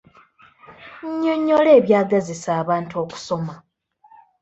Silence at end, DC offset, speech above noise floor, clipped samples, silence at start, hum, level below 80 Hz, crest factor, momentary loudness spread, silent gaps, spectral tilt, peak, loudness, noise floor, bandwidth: 0.85 s; under 0.1%; 36 dB; under 0.1%; 0.7 s; none; -62 dBFS; 18 dB; 17 LU; none; -6.5 dB/octave; -2 dBFS; -19 LUFS; -54 dBFS; 8.2 kHz